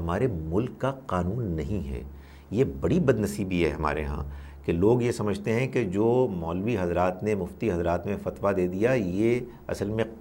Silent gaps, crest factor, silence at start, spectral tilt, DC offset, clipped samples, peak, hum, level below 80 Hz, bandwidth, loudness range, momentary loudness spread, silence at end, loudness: none; 18 dB; 0 s; -7.5 dB/octave; under 0.1%; under 0.1%; -8 dBFS; none; -42 dBFS; 16.5 kHz; 2 LU; 9 LU; 0 s; -27 LUFS